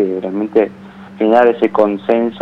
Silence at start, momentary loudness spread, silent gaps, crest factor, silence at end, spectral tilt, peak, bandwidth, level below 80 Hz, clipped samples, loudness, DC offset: 0 s; 8 LU; none; 14 dB; 0 s; -8 dB/octave; 0 dBFS; 5.8 kHz; -60 dBFS; under 0.1%; -14 LUFS; under 0.1%